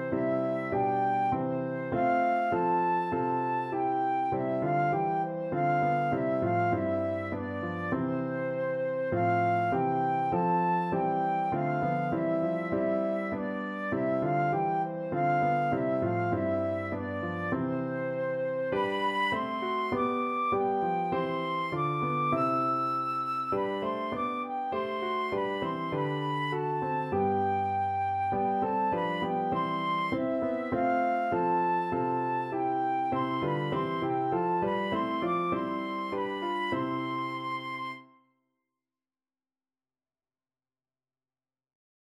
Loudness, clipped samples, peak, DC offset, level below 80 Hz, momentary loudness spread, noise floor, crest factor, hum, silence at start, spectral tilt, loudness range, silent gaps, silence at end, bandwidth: -30 LUFS; under 0.1%; -16 dBFS; under 0.1%; -64 dBFS; 5 LU; under -90 dBFS; 14 dB; none; 0 s; -8 dB/octave; 3 LU; none; 4.15 s; 11.5 kHz